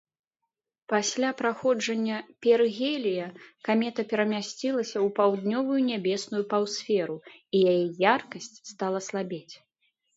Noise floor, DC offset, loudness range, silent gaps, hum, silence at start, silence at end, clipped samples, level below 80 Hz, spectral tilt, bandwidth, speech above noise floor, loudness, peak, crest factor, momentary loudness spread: -85 dBFS; under 0.1%; 1 LU; none; none; 0.9 s; 0.6 s; under 0.1%; -78 dBFS; -4.5 dB/octave; 8 kHz; 58 dB; -27 LUFS; -6 dBFS; 22 dB; 11 LU